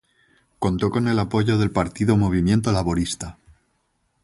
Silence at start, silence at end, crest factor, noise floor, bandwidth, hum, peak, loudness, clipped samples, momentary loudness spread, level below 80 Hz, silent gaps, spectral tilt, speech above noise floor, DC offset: 0.6 s; 0.9 s; 18 dB; -69 dBFS; 11.5 kHz; none; -4 dBFS; -21 LUFS; under 0.1%; 8 LU; -40 dBFS; none; -6.5 dB/octave; 49 dB; under 0.1%